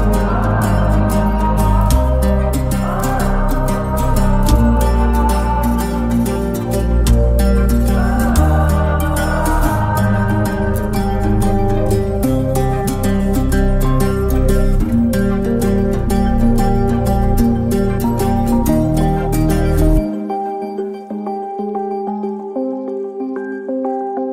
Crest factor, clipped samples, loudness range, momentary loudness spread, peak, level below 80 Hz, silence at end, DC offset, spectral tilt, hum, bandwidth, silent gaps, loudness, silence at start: 14 dB; under 0.1%; 4 LU; 8 LU; 0 dBFS; -18 dBFS; 0 s; under 0.1%; -7 dB/octave; none; 16 kHz; none; -16 LUFS; 0 s